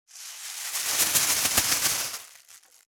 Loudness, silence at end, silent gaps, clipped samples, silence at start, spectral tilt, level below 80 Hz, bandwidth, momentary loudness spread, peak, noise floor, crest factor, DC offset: -23 LUFS; 0.35 s; none; under 0.1%; 0.15 s; 1 dB/octave; -58 dBFS; over 20 kHz; 17 LU; -6 dBFS; -54 dBFS; 24 dB; under 0.1%